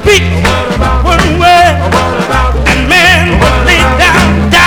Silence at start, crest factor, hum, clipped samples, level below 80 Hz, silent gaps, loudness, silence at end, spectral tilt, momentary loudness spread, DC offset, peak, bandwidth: 0 s; 6 dB; none; 3%; -14 dBFS; none; -7 LUFS; 0 s; -4.5 dB/octave; 6 LU; under 0.1%; 0 dBFS; over 20 kHz